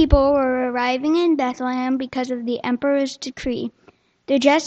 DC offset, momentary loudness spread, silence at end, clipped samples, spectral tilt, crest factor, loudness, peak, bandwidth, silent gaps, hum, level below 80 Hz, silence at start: under 0.1%; 10 LU; 0 s; under 0.1%; -5.5 dB/octave; 20 dB; -21 LUFS; 0 dBFS; 8.4 kHz; none; none; -30 dBFS; 0 s